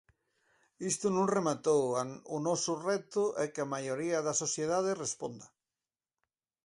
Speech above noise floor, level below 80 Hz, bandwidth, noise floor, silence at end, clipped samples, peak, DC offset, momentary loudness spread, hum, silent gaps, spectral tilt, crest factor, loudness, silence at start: over 57 dB; -76 dBFS; 11.5 kHz; under -90 dBFS; 1.2 s; under 0.1%; -16 dBFS; under 0.1%; 8 LU; none; none; -4 dB/octave; 18 dB; -33 LUFS; 0.8 s